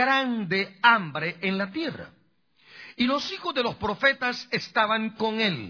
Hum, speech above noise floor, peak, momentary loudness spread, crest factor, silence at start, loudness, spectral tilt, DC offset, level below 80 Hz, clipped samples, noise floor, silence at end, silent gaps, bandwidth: none; 38 dB; -4 dBFS; 10 LU; 22 dB; 0 s; -25 LUFS; -5 dB/octave; under 0.1%; -62 dBFS; under 0.1%; -64 dBFS; 0 s; none; 5.4 kHz